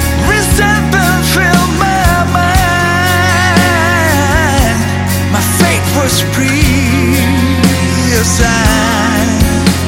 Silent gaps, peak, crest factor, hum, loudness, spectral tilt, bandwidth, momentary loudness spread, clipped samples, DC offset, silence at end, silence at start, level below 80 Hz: none; 0 dBFS; 10 dB; none; -10 LUFS; -4.5 dB/octave; 17 kHz; 2 LU; 0.1%; under 0.1%; 0 s; 0 s; -20 dBFS